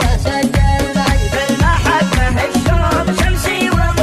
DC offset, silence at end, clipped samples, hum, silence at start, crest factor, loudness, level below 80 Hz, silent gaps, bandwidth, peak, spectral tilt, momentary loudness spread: under 0.1%; 0 s; under 0.1%; none; 0 s; 12 dB; -14 LUFS; -18 dBFS; none; 14.5 kHz; -2 dBFS; -5 dB/octave; 2 LU